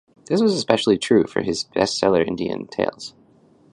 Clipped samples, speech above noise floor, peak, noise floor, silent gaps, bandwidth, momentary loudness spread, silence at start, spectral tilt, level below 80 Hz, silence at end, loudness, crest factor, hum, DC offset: under 0.1%; 34 dB; 0 dBFS; -54 dBFS; none; 11 kHz; 8 LU; 0.3 s; -5 dB/octave; -54 dBFS; 0.65 s; -20 LUFS; 20 dB; none; under 0.1%